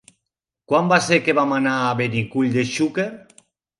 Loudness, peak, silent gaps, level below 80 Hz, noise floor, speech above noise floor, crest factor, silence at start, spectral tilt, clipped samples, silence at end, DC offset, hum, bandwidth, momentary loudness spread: -19 LUFS; -2 dBFS; none; -62 dBFS; -82 dBFS; 63 dB; 20 dB; 0.7 s; -5 dB/octave; under 0.1%; 0.6 s; under 0.1%; none; 11.5 kHz; 6 LU